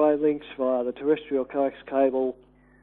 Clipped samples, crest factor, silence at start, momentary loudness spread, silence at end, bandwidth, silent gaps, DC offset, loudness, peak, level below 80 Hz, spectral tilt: under 0.1%; 14 dB; 0 s; 5 LU; 0.5 s; 4 kHz; none; under 0.1%; -26 LUFS; -10 dBFS; -62 dBFS; -9.5 dB/octave